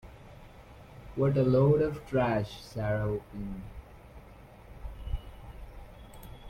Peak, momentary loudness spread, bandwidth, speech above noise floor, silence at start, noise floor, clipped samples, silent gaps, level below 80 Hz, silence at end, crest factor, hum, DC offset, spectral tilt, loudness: -14 dBFS; 27 LU; 14.5 kHz; 23 dB; 0.05 s; -51 dBFS; under 0.1%; none; -46 dBFS; 0 s; 18 dB; none; under 0.1%; -8.5 dB/octave; -30 LUFS